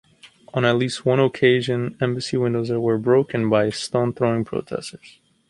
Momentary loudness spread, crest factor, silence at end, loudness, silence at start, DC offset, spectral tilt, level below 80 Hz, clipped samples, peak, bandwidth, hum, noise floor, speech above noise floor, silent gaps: 9 LU; 18 dB; 0.4 s; -21 LUFS; 0.25 s; under 0.1%; -6 dB/octave; -58 dBFS; under 0.1%; -4 dBFS; 11.5 kHz; none; -48 dBFS; 28 dB; none